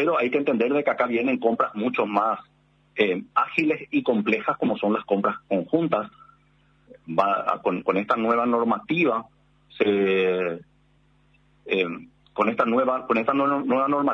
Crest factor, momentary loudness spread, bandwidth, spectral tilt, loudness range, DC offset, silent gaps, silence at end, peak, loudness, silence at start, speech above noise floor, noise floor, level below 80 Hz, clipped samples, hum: 18 dB; 6 LU; 7.8 kHz; -7.5 dB/octave; 2 LU; under 0.1%; none; 0 s; -6 dBFS; -23 LUFS; 0 s; 38 dB; -61 dBFS; -68 dBFS; under 0.1%; none